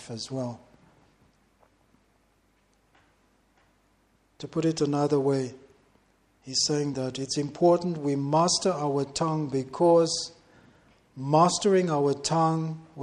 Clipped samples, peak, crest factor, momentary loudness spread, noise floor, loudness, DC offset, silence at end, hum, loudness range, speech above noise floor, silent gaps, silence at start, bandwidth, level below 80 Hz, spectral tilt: under 0.1%; -8 dBFS; 20 dB; 13 LU; -67 dBFS; -26 LUFS; under 0.1%; 0 s; none; 9 LU; 41 dB; none; 0 s; 11.5 kHz; -66 dBFS; -5 dB/octave